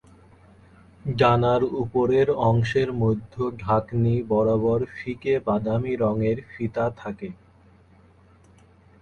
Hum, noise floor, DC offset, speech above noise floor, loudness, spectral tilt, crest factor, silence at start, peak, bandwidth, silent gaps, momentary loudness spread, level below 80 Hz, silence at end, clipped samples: none; -54 dBFS; under 0.1%; 32 dB; -23 LUFS; -8.5 dB/octave; 18 dB; 1.05 s; -6 dBFS; 7 kHz; none; 10 LU; -50 dBFS; 1.65 s; under 0.1%